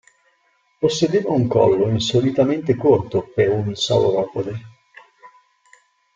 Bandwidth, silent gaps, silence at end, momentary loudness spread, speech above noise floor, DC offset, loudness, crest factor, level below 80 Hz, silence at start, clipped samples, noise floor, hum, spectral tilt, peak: 7.6 kHz; none; 0.9 s; 7 LU; 45 dB; under 0.1%; -19 LUFS; 18 dB; -54 dBFS; 0.8 s; under 0.1%; -63 dBFS; none; -6 dB/octave; -2 dBFS